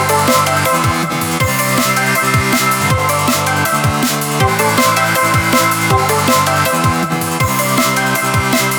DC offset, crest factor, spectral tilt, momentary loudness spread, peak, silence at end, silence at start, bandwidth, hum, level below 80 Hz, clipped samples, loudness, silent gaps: under 0.1%; 14 dB; -3.5 dB/octave; 3 LU; 0 dBFS; 0 s; 0 s; over 20 kHz; none; -38 dBFS; under 0.1%; -13 LUFS; none